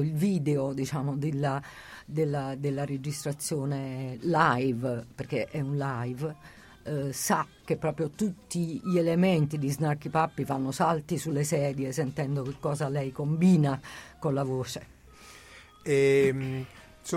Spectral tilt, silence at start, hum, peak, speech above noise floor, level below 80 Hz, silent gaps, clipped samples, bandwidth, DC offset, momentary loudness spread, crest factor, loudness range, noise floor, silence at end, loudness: -6 dB/octave; 0 s; none; -8 dBFS; 23 dB; -60 dBFS; none; under 0.1%; 16.5 kHz; under 0.1%; 12 LU; 20 dB; 4 LU; -51 dBFS; 0 s; -29 LUFS